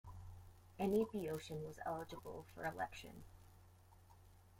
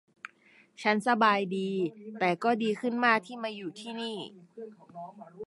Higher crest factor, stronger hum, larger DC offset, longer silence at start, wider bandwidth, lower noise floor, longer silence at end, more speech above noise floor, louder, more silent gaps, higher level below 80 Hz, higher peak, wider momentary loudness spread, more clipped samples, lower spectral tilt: about the same, 20 dB vs 22 dB; neither; neither; second, 0.05 s vs 0.8 s; first, 16.5 kHz vs 11.5 kHz; about the same, -65 dBFS vs -62 dBFS; about the same, 0 s vs 0 s; second, 21 dB vs 31 dB; second, -44 LUFS vs -29 LUFS; neither; first, -66 dBFS vs -84 dBFS; second, -26 dBFS vs -10 dBFS; first, 25 LU vs 22 LU; neither; about the same, -6 dB/octave vs -5.5 dB/octave